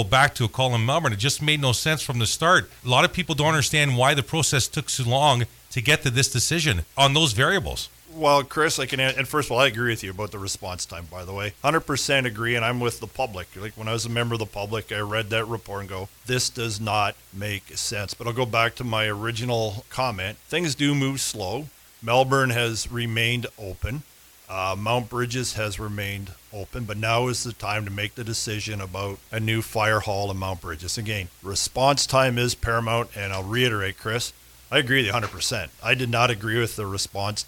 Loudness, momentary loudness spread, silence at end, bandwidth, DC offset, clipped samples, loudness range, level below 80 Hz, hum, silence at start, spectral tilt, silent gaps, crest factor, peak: -23 LUFS; 12 LU; 0 s; 18 kHz; under 0.1%; under 0.1%; 6 LU; -46 dBFS; none; 0 s; -3.5 dB/octave; none; 20 dB; -4 dBFS